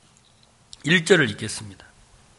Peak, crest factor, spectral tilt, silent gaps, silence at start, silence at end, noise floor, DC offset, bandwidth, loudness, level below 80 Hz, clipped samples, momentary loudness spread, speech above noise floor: -2 dBFS; 22 dB; -4 dB/octave; none; 0.85 s; 0.65 s; -57 dBFS; under 0.1%; 11.5 kHz; -20 LUFS; -60 dBFS; under 0.1%; 17 LU; 36 dB